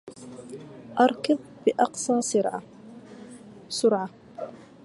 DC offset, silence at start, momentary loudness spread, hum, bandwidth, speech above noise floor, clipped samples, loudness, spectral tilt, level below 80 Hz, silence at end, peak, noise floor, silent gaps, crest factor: under 0.1%; 0.05 s; 22 LU; none; 11.5 kHz; 22 dB; under 0.1%; -25 LUFS; -4 dB/octave; -70 dBFS; 0.2 s; -6 dBFS; -45 dBFS; none; 22 dB